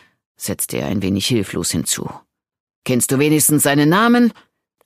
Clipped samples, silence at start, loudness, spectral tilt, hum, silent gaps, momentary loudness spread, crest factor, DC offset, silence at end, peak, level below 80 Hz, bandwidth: under 0.1%; 0.4 s; -16 LUFS; -4 dB/octave; none; 2.60-2.67 s, 2.76-2.82 s; 11 LU; 16 dB; under 0.1%; 0.55 s; -2 dBFS; -52 dBFS; 15.5 kHz